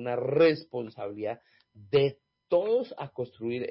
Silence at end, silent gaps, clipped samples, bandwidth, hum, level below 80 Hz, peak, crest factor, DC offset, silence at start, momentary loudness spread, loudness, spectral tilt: 0 s; none; under 0.1%; 5.8 kHz; none; -68 dBFS; -14 dBFS; 16 dB; under 0.1%; 0 s; 14 LU; -29 LUFS; -10.5 dB/octave